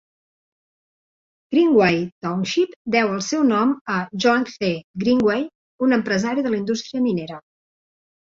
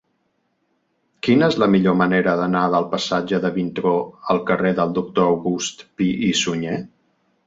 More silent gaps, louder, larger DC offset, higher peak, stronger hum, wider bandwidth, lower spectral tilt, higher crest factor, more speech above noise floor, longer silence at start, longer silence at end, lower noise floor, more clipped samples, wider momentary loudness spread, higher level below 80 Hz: first, 2.12-2.21 s, 2.76-2.85 s, 3.81-3.85 s, 4.84-4.94 s, 5.55-5.79 s vs none; about the same, -20 LUFS vs -20 LUFS; neither; about the same, -4 dBFS vs -4 dBFS; neither; about the same, 7.6 kHz vs 7.8 kHz; about the same, -5.5 dB/octave vs -5.5 dB/octave; about the same, 18 dB vs 16 dB; first, over 70 dB vs 50 dB; first, 1.5 s vs 1.25 s; first, 0.9 s vs 0.6 s; first, under -90 dBFS vs -69 dBFS; neither; about the same, 9 LU vs 8 LU; about the same, -60 dBFS vs -56 dBFS